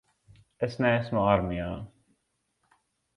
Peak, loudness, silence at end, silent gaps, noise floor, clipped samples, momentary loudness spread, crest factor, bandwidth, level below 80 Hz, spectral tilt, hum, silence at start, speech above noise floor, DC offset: -8 dBFS; -27 LUFS; 1.3 s; none; -77 dBFS; under 0.1%; 14 LU; 22 dB; 11 kHz; -50 dBFS; -8 dB/octave; none; 0.6 s; 50 dB; under 0.1%